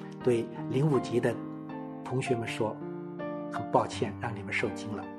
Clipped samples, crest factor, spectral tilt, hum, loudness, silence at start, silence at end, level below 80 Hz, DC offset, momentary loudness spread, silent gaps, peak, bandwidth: under 0.1%; 22 dB; -6.5 dB/octave; none; -32 LUFS; 0 s; 0 s; -68 dBFS; under 0.1%; 12 LU; none; -10 dBFS; 12.5 kHz